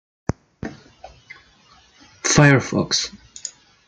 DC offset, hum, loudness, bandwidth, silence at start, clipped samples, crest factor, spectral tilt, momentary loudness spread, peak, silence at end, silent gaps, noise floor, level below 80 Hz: under 0.1%; none; -18 LUFS; 9.4 kHz; 0.65 s; under 0.1%; 20 dB; -4 dB/octave; 22 LU; -2 dBFS; 0.4 s; none; -53 dBFS; -46 dBFS